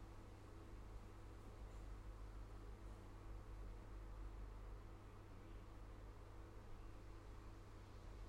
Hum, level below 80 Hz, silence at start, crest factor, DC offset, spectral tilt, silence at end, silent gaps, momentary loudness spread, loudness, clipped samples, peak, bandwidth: none; -58 dBFS; 0 s; 12 dB; under 0.1%; -6.5 dB/octave; 0 s; none; 3 LU; -59 LUFS; under 0.1%; -44 dBFS; 15 kHz